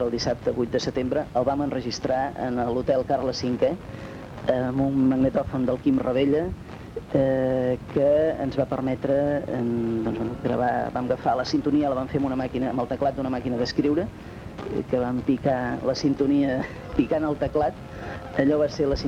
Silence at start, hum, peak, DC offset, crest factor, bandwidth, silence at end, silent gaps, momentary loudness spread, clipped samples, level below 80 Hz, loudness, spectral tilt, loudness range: 0 s; none; -8 dBFS; under 0.1%; 16 dB; 9.2 kHz; 0 s; none; 8 LU; under 0.1%; -46 dBFS; -25 LUFS; -7 dB/octave; 2 LU